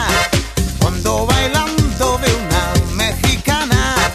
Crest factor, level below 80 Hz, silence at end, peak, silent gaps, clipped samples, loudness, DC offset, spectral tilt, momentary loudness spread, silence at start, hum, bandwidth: 16 dB; -24 dBFS; 0 s; 0 dBFS; none; under 0.1%; -15 LUFS; under 0.1%; -4 dB/octave; 3 LU; 0 s; none; 14 kHz